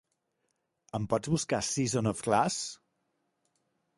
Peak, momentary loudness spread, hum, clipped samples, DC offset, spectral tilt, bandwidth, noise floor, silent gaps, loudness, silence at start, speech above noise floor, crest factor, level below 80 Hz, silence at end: -10 dBFS; 10 LU; none; under 0.1%; under 0.1%; -4.5 dB/octave; 11.5 kHz; -80 dBFS; none; -31 LUFS; 0.95 s; 50 dB; 22 dB; -62 dBFS; 1.25 s